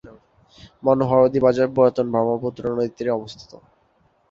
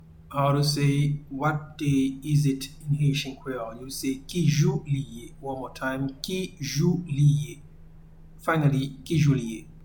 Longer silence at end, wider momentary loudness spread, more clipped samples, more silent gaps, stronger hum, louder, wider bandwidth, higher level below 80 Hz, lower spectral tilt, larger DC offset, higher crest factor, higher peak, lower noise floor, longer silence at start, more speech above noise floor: first, 0.9 s vs 0 s; second, 9 LU vs 12 LU; neither; neither; neither; first, -20 LUFS vs -26 LUFS; second, 7.4 kHz vs 19 kHz; second, -54 dBFS vs -48 dBFS; first, -8 dB/octave vs -6 dB/octave; neither; about the same, 18 dB vs 18 dB; first, -2 dBFS vs -8 dBFS; first, -62 dBFS vs -47 dBFS; about the same, 0.05 s vs 0.1 s; first, 42 dB vs 22 dB